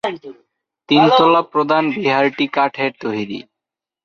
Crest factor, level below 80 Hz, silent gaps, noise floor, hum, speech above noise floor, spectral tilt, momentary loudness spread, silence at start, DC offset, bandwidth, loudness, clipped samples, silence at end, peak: 16 dB; -64 dBFS; none; -85 dBFS; none; 69 dB; -6.5 dB/octave; 14 LU; 0.05 s; under 0.1%; 7 kHz; -16 LUFS; under 0.1%; 0.65 s; -2 dBFS